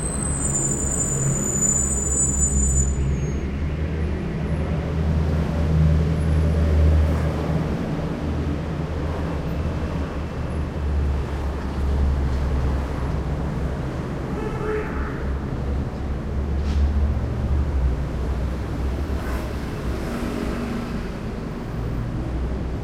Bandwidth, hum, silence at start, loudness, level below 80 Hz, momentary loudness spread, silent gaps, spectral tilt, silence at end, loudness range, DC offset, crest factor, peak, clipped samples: 16.5 kHz; none; 0 s; -24 LUFS; -26 dBFS; 9 LU; none; -5.5 dB/octave; 0 s; 6 LU; under 0.1%; 16 dB; -6 dBFS; under 0.1%